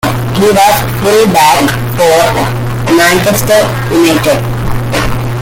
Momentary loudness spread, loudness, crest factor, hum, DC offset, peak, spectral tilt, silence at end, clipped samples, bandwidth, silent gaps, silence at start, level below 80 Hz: 7 LU; -9 LUFS; 8 dB; none; under 0.1%; 0 dBFS; -4.5 dB/octave; 0 s; 0.1%; 17.5 kHz; none; 0.05 s; -26 dBFS